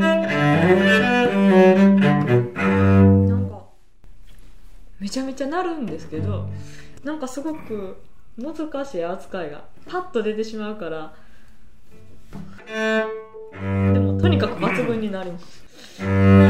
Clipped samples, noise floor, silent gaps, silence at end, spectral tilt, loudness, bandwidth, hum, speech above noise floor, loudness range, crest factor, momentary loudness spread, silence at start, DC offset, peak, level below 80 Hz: under 0.1%; -49 dBFS; none; 0 s; -7.5 dB/octave; -20 LUFS; 11 kHz; none; 28 dB; 14 LU; 18 dB; 20 LU; 0 s; 2%; -2 dBFS; -52 dBFS